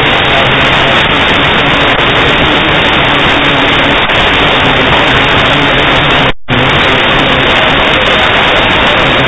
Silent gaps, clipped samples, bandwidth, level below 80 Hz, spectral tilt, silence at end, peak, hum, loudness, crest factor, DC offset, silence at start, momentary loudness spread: none; 2%; 8 kHz; -24 dBFS; -5 dB/octave; 0 s; 0 dBFS; none; -6 LUFS; 8 dB; under 0.1%; 0 s; 1 LU